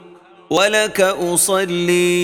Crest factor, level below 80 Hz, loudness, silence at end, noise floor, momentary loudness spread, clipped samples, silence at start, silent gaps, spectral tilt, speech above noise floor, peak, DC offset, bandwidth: 16 dB; -54 dBFS; -16 LUFS; 0 s; -44 dBFS; 2 LU; under 0.1%; 0.5 s; none; -3 dB/octave; 28 dB; 0 dBFS; under 0.1%; 17.5 kHz